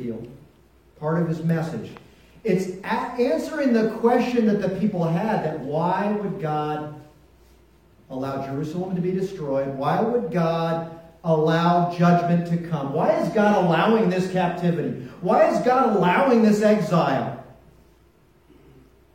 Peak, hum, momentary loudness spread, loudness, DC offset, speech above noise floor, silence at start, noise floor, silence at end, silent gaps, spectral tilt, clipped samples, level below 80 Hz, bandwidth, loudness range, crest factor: -6 dBFS; none; 12 LU; -22 LUFS; under 0.1%; 35 dB; 0 s; -57 dBFS; 1.65 s; none; -7.5 dB/octave; under 0.1%; -58 dBFS; 14.5 kHz; 8 LU; 16 dB